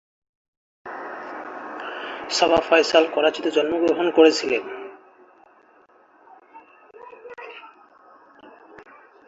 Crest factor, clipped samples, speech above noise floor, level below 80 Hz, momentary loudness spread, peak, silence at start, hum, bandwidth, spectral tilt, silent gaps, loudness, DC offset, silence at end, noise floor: 22 dB; under 0.1%; 37 dB; -62 dBFS; 23 LU; -2 dBFS; 0.85 s; none; 8 kHz; -3 dB/octave; none; -20 LUFS; under 0.1%; 0.45 s; -55 dBFS